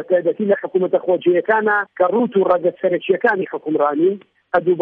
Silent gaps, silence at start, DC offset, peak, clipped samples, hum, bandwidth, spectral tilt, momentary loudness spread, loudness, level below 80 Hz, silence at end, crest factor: none; 0 s; under 0.1%; -2 dBFS; under 0.1%; none; 4.1 kHz; -9 dB/octave; 4 LU; -18 LUFS; -64 dBFS; 0 s; 14 dB